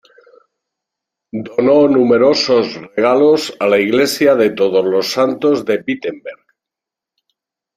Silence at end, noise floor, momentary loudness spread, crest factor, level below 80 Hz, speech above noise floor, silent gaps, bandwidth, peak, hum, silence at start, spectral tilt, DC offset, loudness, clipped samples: 1.4 s; -85 dBFS; 11 LU; 14 dB; -60 dBFS; 72 dB; none; 16 kHz; 0 dBFS; none; 1.35 s; -4.5 dB/octave; under 0.1%; -13 LUFS; under 0.1%